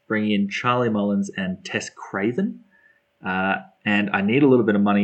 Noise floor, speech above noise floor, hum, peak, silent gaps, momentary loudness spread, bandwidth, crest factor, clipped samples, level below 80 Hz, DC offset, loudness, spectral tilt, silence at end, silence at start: -59 dBFS; 38 dB; none; -6 dBFS; none; 11 LU; 8.6 kHz; 16 dB; under 0.1%; -70 dBFS; under 0.1%; -22 LUFS; -6 dB/octave; 0 s; 0.1 s